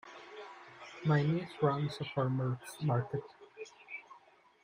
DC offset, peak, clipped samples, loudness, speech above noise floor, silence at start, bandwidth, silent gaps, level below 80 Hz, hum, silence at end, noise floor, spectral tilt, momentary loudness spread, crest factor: under 0.1%; -16 dBFS; under 0.1%; -34 LUFS; 30 dB; 0.05 s; 15 kHz; none; -72 dBFS; none; 0.45 s; -63 dBFS; -7.5 dB/octave; 19 LU; 20 dB